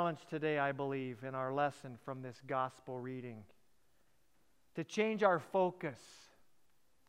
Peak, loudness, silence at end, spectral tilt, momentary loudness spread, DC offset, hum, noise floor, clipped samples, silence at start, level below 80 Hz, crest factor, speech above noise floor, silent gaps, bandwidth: -16 dBFS; -38 LUFS; 0.85 s; -6 dB/octave; 17 LU; under 0.1%; none; -77 dBFS; under 0.1%; 0 s; -84 dBFS; 24 dB; 39 dB; none; 15 kHz